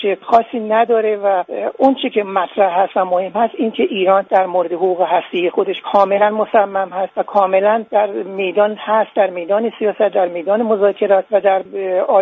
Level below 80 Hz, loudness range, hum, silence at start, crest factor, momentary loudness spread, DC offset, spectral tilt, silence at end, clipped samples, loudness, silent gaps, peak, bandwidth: -66 dBFS; 1 LU; none; 0 s; 16 dB; 5 LU; under 0.1%; -3 dB/octave; 0 s; under 0.1%; -16 LUFS; none; 0 dBFS; 4.8 kHz